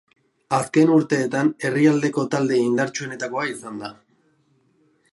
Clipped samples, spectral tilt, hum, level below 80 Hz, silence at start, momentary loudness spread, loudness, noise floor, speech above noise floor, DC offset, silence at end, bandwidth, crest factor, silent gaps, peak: under 0.1%; -6 dB/octave; none; -68 dBFS; 0.5 s; 13 LU; -21 LUFS; -63 dBFS; 43 dB; under 0.1%; 1.2 s; 11.5 kHz; 16 dB; none; -4 dBFS